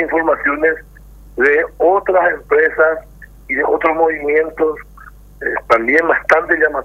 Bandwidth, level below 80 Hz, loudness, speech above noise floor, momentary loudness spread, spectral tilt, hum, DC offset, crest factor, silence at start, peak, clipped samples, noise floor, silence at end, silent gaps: 13.5 kHz; -42 dBFS; -14 LUFS; 24 dB; 9 LU; -6 dB/octave; 50 Hz at -40 dBFS; under 0.1%; 16 dB; 0 s; 0 dBFS; under 0.1%; -39 dBFS; 0 s; none